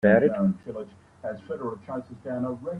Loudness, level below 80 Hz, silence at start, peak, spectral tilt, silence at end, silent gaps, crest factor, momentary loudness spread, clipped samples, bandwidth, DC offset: -28 LUFS; -62 dBFS; 0.05 s; -6 dBFS; -9.5 dB/octave; 0 s; none; 20 dB; 17 LU; under 0.1%; 4.9 kHz; under 0.1%